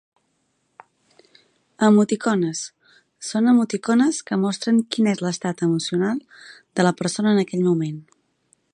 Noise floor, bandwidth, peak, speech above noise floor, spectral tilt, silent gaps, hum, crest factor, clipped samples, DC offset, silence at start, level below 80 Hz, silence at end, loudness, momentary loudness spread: -70 dBFS; 11 kHz; -4 dBFS; 50 dB; -5.5 dB/octave; none; none; 18 dB; under 0.1%; under 0.1%; 1.8 s; -70 dBFS; 0.75 s; -21 LUFS; 12 LU